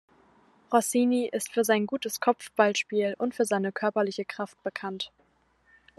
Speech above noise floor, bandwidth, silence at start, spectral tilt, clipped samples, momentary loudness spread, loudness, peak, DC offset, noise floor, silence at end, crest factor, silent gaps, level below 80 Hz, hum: 40 dB; 13 kHz; 0.7 s; -4 dB/octave; under 0.1%; 10 LU; -28 LUFS; -6 dBFS; under 0.1%; -67 dBFS; 0.9 s; 22 dB; none; -76 dBFS; none